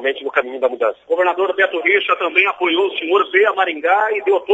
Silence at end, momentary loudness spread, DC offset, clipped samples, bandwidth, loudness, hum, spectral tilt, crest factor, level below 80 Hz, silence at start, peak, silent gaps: 0 s; 5 LU; under 0.1%; under 0.1%; 7.8 kHz; -16 LUFS; none; -3.5 dB/octave; 16 dB; -70 dBFS; 0 s; 0 dBFS; none